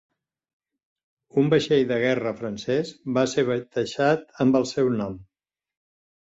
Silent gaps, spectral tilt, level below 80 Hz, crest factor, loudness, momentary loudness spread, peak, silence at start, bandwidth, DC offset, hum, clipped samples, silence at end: none; -6 dB/octave; -60 dBFS; 18 dB; -24 LUFS; 8 LU; -8 dBFS; 1.35 s; 8 kHz; under 0.1%; none; under 0.1%; 1.05 s